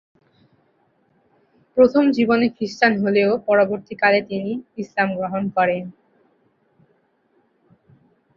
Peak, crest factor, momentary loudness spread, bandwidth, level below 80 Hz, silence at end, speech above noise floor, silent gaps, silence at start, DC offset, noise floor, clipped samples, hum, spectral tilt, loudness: -2 dBFS; 20 dB; 11 LU; 7.4 kHz; -62 dBFS; 2.45 s; 45 dB; none; 1.75 s; under 0.1%; -63 dBFS; under 0.1%; none; -6.5 dB/octave; -19 LUFS